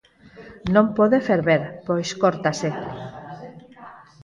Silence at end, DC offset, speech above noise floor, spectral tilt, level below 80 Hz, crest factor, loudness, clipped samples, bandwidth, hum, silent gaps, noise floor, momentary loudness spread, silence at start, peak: 0.25 s; under 0.1%; 25 dB; -6 dB/octave; -54 dBFS; 18 dB; -21 LUFS; under 0.1%; 10.5 kHz; none; none; -45 dBFS; 20 LU; 0.35 s; -4 dBFS